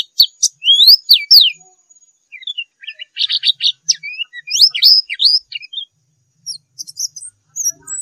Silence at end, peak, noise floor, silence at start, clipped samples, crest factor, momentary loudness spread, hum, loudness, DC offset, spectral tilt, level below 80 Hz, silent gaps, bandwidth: 0 s; 0 dBFS; -63 dBFS; 0.2 s; under 0.1%; 16 dB; 23 LU; none; -9 LUFS; under 0.1%; 5.5 dB/octave; -72 dBFS; none; 16 kHz